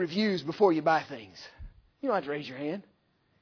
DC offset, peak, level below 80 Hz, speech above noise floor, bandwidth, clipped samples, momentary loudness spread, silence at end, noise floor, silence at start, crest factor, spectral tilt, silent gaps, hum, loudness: under 0.1%; -10 dBFS; -58 dBFS; 41 dB; 5.4 kHz; under 0.1%; 19 LU; 0.6 s; -71 dBFS; 0 s; 20 dB; -6.5 dB/octave; none; none; -29 LUFS